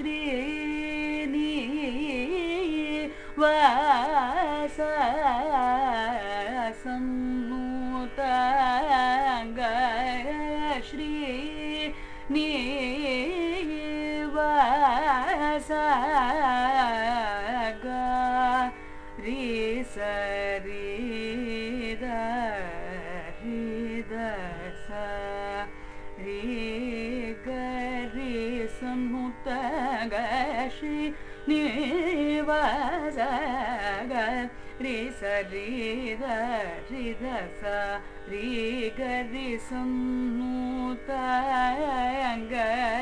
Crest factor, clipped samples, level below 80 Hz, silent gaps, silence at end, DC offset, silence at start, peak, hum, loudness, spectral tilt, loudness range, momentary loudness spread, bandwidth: 20 dB; under 0.1%; -44 dBFS; none; 0 s; under 0.1%; 0 s; -8 dBFS; none; -28 LUFS; -4.5 dB/octave; 8 LU; 10 LU; 10.5 kHz